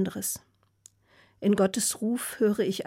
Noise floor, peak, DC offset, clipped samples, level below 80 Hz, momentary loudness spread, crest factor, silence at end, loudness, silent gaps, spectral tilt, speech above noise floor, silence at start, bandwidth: -62 dBFS; -14 dBFS; under 0.1%; under 0.1%; -66 dBFS; 8 LU; 16 dB; 0 s; -27 LUFS; none; -4.5 dB/octave; 35 dB; 0 s; 16.5 kHz